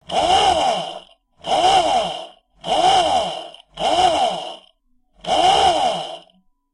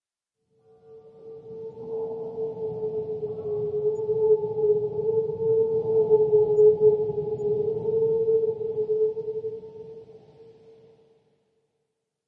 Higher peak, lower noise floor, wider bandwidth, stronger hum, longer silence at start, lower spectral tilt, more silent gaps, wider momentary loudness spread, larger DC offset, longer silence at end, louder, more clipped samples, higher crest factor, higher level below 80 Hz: first, -4 dBFS vs -10 dBFS; second, -60 dBFS vs -82 dBFS; first, 11.5 kHz vs 1.4 kHz; neither; second, 0.1 s vs 0.9 s; second, -2.5 dB/octave vs -10.5 dB/octave; neither; about the same, 18 LU vs 19 LU; neither; second, 0.55 s vs 1.75 s; first, -17 LUFS vs -24 LUFS; neither; about the same, 16 dB vs 16 dB; first, -46 dBFS vs -66 dBFS